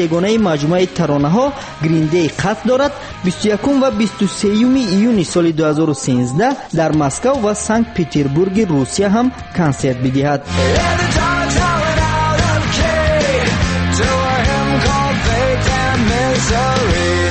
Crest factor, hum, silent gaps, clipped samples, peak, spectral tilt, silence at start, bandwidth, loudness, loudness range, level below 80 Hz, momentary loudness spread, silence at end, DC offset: 10 dB; none; none; under 0.1%; -4 dBFS; -5.5 dB/octave; 0 s; 8.8 kHz; -15 LUFS; 1 LU; -28 dBFS; 3 LU; 0 s; under 0.1%